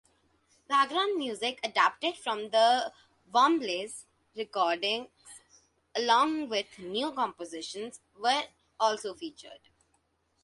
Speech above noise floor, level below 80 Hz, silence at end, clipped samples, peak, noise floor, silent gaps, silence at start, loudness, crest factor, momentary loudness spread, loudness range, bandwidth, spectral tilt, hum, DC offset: 44 dB; -76 dBFS; 0.85 s; under 0.1%; -10 dBFS; -73 dBFS; none; 0.7 s; -29 LUFS; 20 dB; 16 LU; 5 LU; 11.5 kHz; -2 dB/octave; none; under 0.1%